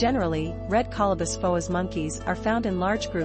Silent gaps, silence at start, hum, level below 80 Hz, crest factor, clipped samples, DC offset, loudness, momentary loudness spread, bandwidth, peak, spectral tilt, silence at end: none; 0 s; none; -40 dBFS; 14 dB; under 0.1%; under 0.1%; -26 LUFS; 5 LU; 8.8 kHz; -10 dBFS; -5.5 dB/octave; 0 s